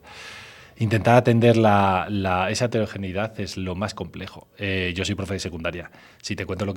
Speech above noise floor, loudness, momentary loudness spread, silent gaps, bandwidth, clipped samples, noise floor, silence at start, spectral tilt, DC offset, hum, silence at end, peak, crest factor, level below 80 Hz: 21 dB; -22 LUFS; 21 LU; none; 16.5 kHz; under 0.1%; -43 dBFS; 0.05 s; -6 dB/octave; under 0.1%; none; 0 s; -2 dBFS; 20 dB; -52 dBFS